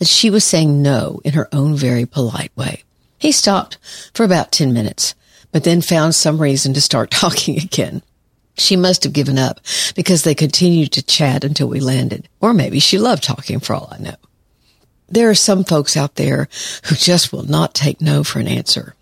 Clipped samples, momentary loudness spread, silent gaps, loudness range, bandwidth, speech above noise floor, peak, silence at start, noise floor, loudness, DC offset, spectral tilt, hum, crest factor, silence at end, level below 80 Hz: under 0.1%; 11 LU; none; 3 LU; 16 kHz; 42 dB; 0 dBFS; 0 s; -57 dBFS; -14 LUFS; under 0.1%; -4 dB/octave; none; 16 dB; 0.1 s; -52 dBFS